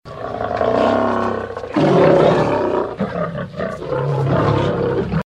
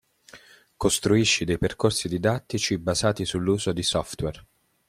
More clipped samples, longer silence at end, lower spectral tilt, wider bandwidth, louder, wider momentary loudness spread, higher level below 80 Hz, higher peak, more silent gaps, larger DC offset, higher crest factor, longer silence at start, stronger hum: neither; second, 0.05 s vs 0.5 s; first, -8 dB/octave vs -4 dB/octave; second, 9.8 kHz vs 15.5 kHz; first, -17 LUFS vs -24 LUFS; first, 12 LU vs 7 LU; first, -40 dBFS vs -48 dBFS; first, 0 dBFS vs -8 dBFS; neither; neither; about the same, 16 dB vs 18 dB; second, 0.05 s vs 0.35 s; neither